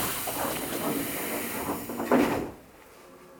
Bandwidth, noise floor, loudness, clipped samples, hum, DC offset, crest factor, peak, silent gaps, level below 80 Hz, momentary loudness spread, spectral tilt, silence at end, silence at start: over 20 kHz; -51 dBFS; -29 LUFS; under 0.1%; none; under 0.1%; 20 dB; -10 dBFS; none; -56 dBFS; 9 LU; -3.5 dB/octave; 0 s; 0 s